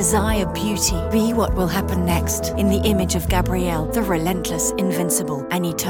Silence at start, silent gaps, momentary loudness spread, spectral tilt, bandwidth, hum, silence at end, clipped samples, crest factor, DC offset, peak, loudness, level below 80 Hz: 0 s; none; 3 LU; -4.5 dB/octave; 18 kHz; none; 0 s; under 0.1%; 12 dB; under 0.1%; -6 dBFS; -20 LUFS; -30 dBFS